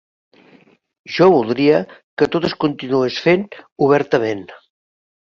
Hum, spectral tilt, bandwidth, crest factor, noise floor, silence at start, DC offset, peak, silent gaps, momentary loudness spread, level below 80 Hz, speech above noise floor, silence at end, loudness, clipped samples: none; -7 dB/octave; 7.2 kHz; 18 dB; -52 dBFS; 1.1 s; under 0.1%; 0 dBFS; 2.04-2.17 s, 3.72-3.76 s; 12 LU; -56 dBFS; 36 dB; 0.65 s; -17 LUFS; under 0.1%